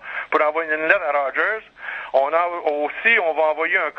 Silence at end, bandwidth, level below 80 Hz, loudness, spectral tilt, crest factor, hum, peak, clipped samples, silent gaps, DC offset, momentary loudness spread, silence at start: 0.05 s; 6 kHz; -66 dBFS; -19 LUFS; -4.5 dB/octave; 18 dB; none; -2 dBFS; under 0.1%; none; under 0.1%; 7 LU; 0 s